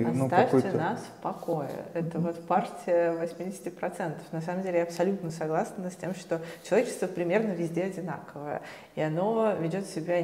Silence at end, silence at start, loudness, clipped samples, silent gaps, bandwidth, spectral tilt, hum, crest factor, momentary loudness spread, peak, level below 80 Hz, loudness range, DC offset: 0 s; 0 s; -30 LUFS; under 0.1%; none; 16 kHz; -6.5 dB/octave; none; 20 dB; 11 LU; -8 dBFS; -74 dBFS; 3 LU; under 0.1%